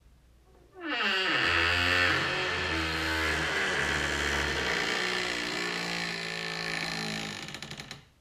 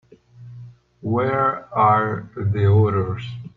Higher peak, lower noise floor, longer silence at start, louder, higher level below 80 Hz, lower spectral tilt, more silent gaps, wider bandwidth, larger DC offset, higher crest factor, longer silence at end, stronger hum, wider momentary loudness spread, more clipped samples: second, -12 dBFS vs -4 dBFS; first, -59 dBFS vs -43 dBFS; first, 0.75 s vs 0.4 s; second, -28 LUFS vs -20 LUFS; first, -48 dBFS vs -54 dBFS; second, -3 dB/octave vs -10 dB/octave; neither; first, 16 kHz vs 4.3 kHz; neither; about the same, 18 dB vs 16 dB; about the same, 0.2 s vs 0.1 s; second, none vs 60 Hz at -40 dBFS; second, 12 LU vs 15 LU; neither